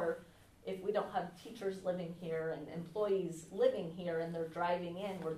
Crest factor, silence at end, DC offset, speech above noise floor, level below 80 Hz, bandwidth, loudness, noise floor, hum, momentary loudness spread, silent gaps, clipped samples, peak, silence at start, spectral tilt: 20 dB; 0 s; under 0.1%; 20 dB; -72 dBFS; 13.5 kHz; -39 LUFS; -59 dBFS; none; 9 LU; none; under 0.1%; -20 dBFS; 0 s; -6.5 dB/octave